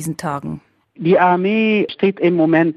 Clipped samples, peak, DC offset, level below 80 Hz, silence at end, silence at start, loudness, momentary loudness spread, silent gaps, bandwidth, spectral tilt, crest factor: under 0.1%; -2 dBFS; under 0.1%; -58 dBFS; 0 s; 0 s; -16 LUFS; 13 LU; none; 14 kHz; -6.5 dB/octave; 14 dB